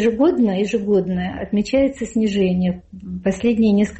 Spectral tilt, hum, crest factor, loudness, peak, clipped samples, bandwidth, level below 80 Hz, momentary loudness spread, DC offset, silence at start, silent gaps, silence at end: -7 dB/octave; none; 12 dB; -19 LUFS; -8 dBFS; under 0.1%; 8.4 kHz; -44 dBFS; 8 LU; under 0.1%; 0 s; none; 0 s